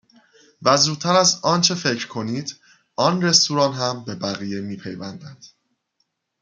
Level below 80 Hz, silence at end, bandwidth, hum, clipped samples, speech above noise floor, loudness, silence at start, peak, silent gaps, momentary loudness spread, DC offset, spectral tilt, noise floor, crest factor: -64 dBFS; 0.95 s; 11 kHz; none; under 0.1%; 52 dB; -19 LUFS; 0.6 s; -2 dBFS; none; 17 LU; under 0.1%; -3 dB/octave; -72 dBFS; 22 dB